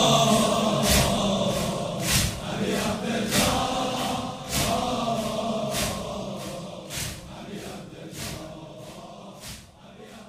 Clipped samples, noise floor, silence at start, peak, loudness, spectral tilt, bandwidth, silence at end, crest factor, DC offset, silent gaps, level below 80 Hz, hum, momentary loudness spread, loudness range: under 0.1%; -47 dBFS; 0 s; -6 dBFS; -25 LUFS; -3.5 dB/octave; 16 kHz; 0 s; 20 dB; under 0.1%; none; -42 dBFS; none; 20 LU; 13 LU